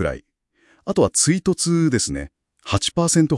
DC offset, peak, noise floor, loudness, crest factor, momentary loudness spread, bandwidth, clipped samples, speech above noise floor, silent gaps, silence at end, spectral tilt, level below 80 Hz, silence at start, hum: under 0.1%; -4 dBFS; -60 dBFS; -19 LUFS; 16 dB; 18 LU; 12 kHz; under 0.1%; 41 dB; none; 0 s; -4.5 dB/octave; -44 dBFS; 0 s; none